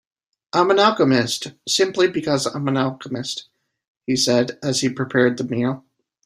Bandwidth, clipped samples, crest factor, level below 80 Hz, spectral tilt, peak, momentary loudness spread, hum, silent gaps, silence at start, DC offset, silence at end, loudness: 14 kHz; under 0.1%; 18 dB; -62 dBFS; -4 dB/octave; -2 dBFS; 11 LU; none; 3.87-4.01 s; 0.55 s; under 0.1%; 0.45 s; -20 LUFS